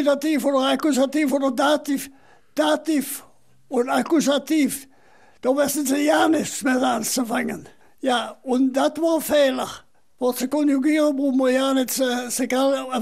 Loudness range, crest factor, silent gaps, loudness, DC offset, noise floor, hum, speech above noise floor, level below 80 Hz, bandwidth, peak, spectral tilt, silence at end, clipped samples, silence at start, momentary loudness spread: 2 LU; 14 dB; none; -21 LUFS; 0.2%; -55 dBFS; none; 35 dB; -66 dBFS; 16 kHz; -6 dBFS; -3 dB/octave; 0 s; under 0.1%; 0 s; 9 LU